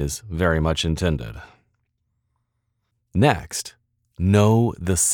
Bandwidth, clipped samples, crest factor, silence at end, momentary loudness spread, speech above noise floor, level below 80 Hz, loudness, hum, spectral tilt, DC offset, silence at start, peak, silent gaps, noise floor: 19 kHz; under 0.1%; 18 dB; 0 s; 13 LU; 54 dB; -38 dBFS; -21 LUFS; none; -5 dB/octave; under 0.1%; 0 s; -4 dBFS; none; -74 dBFS